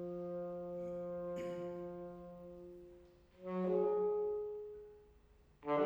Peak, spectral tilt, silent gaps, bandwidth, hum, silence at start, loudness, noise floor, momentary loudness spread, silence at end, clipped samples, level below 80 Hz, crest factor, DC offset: -24 dBFS; -8.5 dB/octave; none; over 20 kHz; none; 0 s; -41 LUFS; -66 dBFS; 20 LU; 0 s; under 0.1%; -70 dBFS; 18 dB; under 0.1%